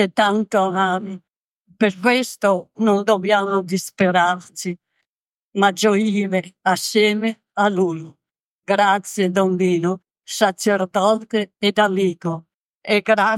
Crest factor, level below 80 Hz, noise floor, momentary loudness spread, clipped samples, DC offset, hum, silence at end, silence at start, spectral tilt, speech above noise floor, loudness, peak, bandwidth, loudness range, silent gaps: 18 dB; -70 dBFS; -90 dBFS; 12 LU; under 0.1%; under 0.1%; none; 0 s; 0 s; -4.5 dB/octave; 72 dB; -19 LUFS; -2 dBFS; 16.5 kHz; 1 LU; 1.37-1.65 s, 5.06-5.50 s, 8.40-8.59 s, 12.54-12.81 s